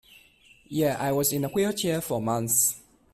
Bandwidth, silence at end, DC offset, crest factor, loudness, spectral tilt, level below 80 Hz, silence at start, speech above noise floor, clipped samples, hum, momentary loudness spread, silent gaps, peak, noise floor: 16 kHz; 0.35 s; under 0.1%; 18 dB; -25 LUFS; -4 dB/octave; -58 dBFS; 0.7 s; 32 dB; under 0.1%; none; 6 LU; none; -10 dBFS; -57 dBFS